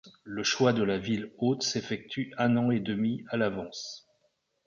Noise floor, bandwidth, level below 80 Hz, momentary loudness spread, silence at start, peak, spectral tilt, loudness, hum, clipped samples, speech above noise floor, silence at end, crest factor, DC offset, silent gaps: -74 dBFS; 7.4 kHz; -64 dBFS; 13 LU; 0.05 s; -12 dBFS; -5 dB/octave; -29 LUFS; none; under 0.1%; 45 dB; 0.65 s; 18 dB; under 0.1%; none